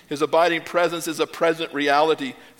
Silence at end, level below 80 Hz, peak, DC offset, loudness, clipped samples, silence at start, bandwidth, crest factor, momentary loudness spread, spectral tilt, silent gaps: 0.2 s; -70 dBFS; -4 dBFS; under 0.1%; -21 LUFS; under 0.1%; 0.1 s; 17.5 kHz; 18 dB; 6 LU; -3.5 dB/octave; none